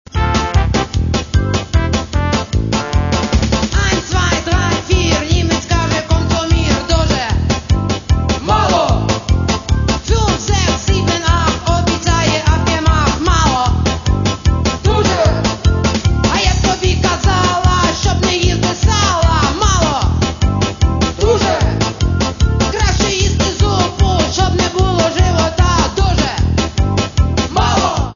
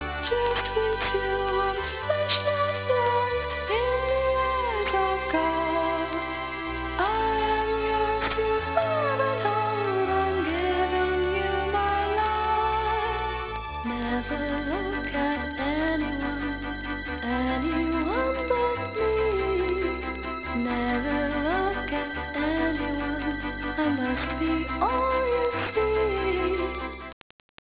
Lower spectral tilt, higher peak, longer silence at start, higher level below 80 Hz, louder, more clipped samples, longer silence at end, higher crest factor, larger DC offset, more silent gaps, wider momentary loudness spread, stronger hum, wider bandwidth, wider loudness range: second, -5 dB/octave vs -9 dB/octave; first, 0 dBFS vs -8 dBFS; about the same, 0.1 s vs 0 s; first, -20 dBFS vs -40 dBFS; first, -14 LUFS vs -26 LUFS; neither; second, 0 s vs 0.55 s; about the same, 14 dB vs 18 dB; second, under 0.1% vs 0.1%; neither; second, 3 LU vs 6 LU; neither; first, 7.4 kHz vs 4 kHz; about the same, 2 LU vs 3 LU